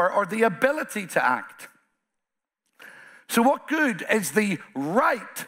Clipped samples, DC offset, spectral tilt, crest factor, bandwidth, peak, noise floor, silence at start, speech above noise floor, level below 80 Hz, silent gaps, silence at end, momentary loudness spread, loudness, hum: under 0.1%; under 0.1%; -4.5 dB/octave; 20 dB; 16 kHz; -4 dBFS; -84 dBFS; 0 s; 60 dB; -74 dBFS; none; 0 s; 7 LU; -24 LUFS; none